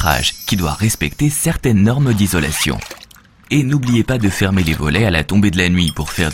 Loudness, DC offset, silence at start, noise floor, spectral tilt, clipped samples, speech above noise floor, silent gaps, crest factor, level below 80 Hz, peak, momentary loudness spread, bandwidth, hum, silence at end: -15 LUFS; under 0.1%; 0 s; -43 dBFS; -5 dB/octave; under 0.1%; 28 dB; none; 16 dB; -30 dBFS; 0 dBFS; 5 LU; 17 kHz; none; 0 s